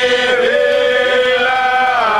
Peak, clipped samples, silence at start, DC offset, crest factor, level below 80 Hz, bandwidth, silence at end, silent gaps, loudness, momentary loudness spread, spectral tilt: -2 dBFS; under 0.1%; 0 s; 0.2%; 10 dB; -50 dBFS; 12.5 kHz; 0 s; none; -12 LUFS; 0 LU; -2 dB/octave